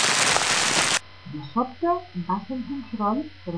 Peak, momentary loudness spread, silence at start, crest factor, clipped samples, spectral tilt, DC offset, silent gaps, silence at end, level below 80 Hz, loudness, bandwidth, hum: -4 dBFS; 13 LU; 0 s; 20 dB; under 0.1%; -2 dB/octave; 0.4%; none; 0 s; -60 dBFS; -23 LUFS; 11 kHz; none